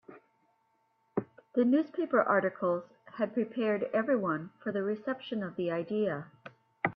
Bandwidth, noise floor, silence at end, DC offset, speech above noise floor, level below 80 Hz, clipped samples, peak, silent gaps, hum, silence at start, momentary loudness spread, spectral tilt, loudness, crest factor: 5.4 kHz; -74 dBFS; 0 s; under 0.1%; 43 dB; -78 dBFS; under 0.1%; -12 dBFS; none; none; 0.1 s; 11 LU; -9.5 dB/octave; -32 LUFS; 20 dB